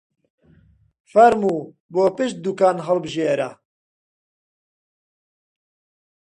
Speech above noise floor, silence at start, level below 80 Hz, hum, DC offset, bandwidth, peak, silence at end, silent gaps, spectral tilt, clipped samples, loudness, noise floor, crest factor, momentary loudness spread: 37 dB; 1.15 s; -64 dBFS; none; under 0.1%; 10.5 kHz; -2 dBFS; 2.8 s; 1.80-1.89 s; -6 dB/octave; under 0.1%; -19 LUFS; -55 dBFS; 22 dB; 11 LU